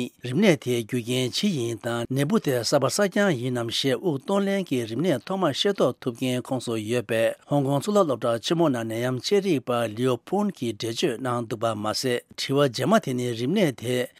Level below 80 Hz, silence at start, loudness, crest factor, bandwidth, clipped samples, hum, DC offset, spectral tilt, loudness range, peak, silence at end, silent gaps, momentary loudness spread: -70 dBFS; 0 s; -25 LUFS; 20 dB; 16 kHz; under 0.1%; none; under 0.1%; -5 dB/octave; 2 LU; -4 dBFS; 0.1 s; none; 6 LU